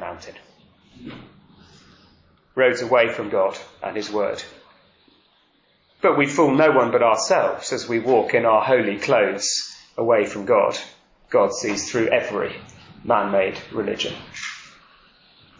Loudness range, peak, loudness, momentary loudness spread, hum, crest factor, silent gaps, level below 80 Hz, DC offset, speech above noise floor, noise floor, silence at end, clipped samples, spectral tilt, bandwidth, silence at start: 6 LU; -4 dBFS; -20 LUFS; 16 LU; none; 18 dB; none; -60 dBFS; under 0.1%; 41 dB; -61 dBFS; 0.9 s; under 0.1%; -4 dB/octave; 7.6 kHz; 0 s